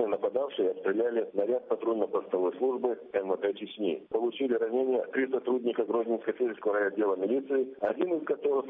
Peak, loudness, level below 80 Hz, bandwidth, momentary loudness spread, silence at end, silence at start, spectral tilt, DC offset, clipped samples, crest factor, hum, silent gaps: -14 dBFS; -30 LUFS; -78 dBFS; 3.8 kHz; 3 LU; 0 s; 0 s; -8 dB/octave; under 0.1%; under 0.1%; 16 dB; none; none